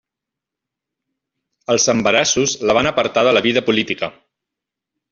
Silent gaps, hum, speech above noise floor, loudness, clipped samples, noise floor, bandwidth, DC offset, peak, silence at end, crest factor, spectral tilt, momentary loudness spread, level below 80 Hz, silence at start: none; none; 68 dB; -16 LUFS; under 0.1%; -84 dBFS; 7.6 kHz; under 0.1%; -2 dBFS; 1 s; 18 dB; -2.5 dB/octave; 9 LU; -54 dBFS; 1.7 s